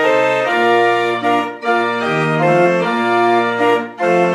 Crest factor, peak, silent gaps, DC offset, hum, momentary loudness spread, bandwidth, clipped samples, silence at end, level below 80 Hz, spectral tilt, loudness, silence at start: 12 dB; -2 dBFS; none; under 0.1%; none; 4 LU; 12 kHz; under 0.1%; 0 s; -64 dBFS; -6 dB/octave; -15 LUFS; 0 s